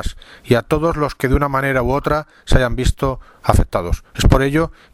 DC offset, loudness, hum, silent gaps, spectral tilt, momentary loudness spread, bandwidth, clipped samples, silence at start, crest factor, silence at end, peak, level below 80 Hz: under 0.1%; -18 LUFS; none; none; -6 dB/octave; 7 LU; 16 kHz; under 0.1%; 0 s; 16 dB; 0.2 s; 0 dBFS; -22 dBFS